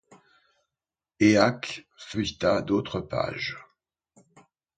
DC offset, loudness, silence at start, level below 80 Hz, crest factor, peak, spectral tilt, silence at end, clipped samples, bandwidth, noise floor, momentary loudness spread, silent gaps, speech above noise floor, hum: under 0.1%; -26 LUFS; 1.2 s; -56 dBFS; 22 dB; -6 dBFS; -5.5 dB/octave; 1.15 s; under 0.1%; 9 kHz; under -90 dBFS; 15 LU; none; over 65 dB; none